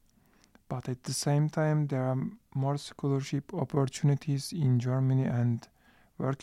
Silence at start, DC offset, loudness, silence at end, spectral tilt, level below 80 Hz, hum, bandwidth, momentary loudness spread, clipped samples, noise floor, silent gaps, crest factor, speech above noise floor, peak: 0.7 s; under 0.1%; -31 LUFS; 0 s; -6.5 dB/octave; -66 dBFS; none; 13 kHz; 8 LU; under 0.1%; -64 dBFS; none; 14 dB; 35 dB; -16 dBFS